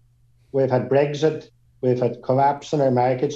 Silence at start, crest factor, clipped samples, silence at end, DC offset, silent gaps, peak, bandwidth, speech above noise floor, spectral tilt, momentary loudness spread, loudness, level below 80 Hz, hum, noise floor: 0.55 s; 16 dB; under 0.1%; 0 s; under 0.1%; none; -6 dBFS; 7.8 kHz; 37 dB; -7.5 dB/octave; 6 LU; -21 LUFS; -62 dBFS; none; -57 dBFS